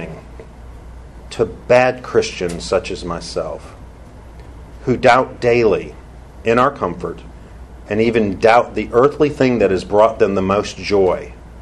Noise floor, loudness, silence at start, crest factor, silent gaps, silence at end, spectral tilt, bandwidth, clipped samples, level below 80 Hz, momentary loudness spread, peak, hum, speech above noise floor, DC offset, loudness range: -37 dBFS; -16 LUFS; 0 s; 18 dB; none; 0 s; -6 dB/octave; 11.5 kHz; under 0.1%; -38 dBFS; 15 LU; 0 dBFS; none; 22 dB; under 0.1%; 5 LU